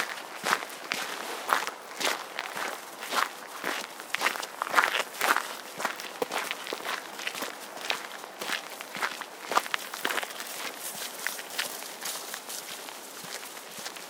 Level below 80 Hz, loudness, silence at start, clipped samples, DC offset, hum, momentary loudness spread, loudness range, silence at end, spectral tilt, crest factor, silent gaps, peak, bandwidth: -86 dBFS; -32 LUFS; 0 s; under 0.1%; under 0.1%; none; 10 LU; 5 LU; 0 s; 0 dB/octave; 30 dB; none; -4 dBFS; 19 kHz